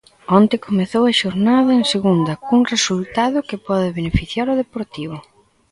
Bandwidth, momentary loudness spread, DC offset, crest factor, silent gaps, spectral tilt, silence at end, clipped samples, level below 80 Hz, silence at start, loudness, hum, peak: 11 kHz; 12 LU; under 0.1%; 16 dB; none; -5 dB/octave; 0.5 s; under 0.1%; -40 dBFS; 0.3 s; -17 LUFS; none; 0 dBFS